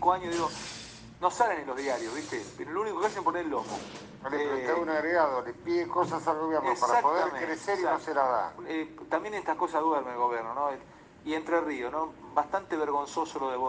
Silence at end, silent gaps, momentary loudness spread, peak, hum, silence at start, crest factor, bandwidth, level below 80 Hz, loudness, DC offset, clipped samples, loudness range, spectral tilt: 0 s; none; 9 LU; -10 dBFS; none; 0 s; 20 dB; 9.8 kHz; -64 dBFS; -30 LUFS; under 0.1%; under 0.1%; 4 LU; -4 dB/octave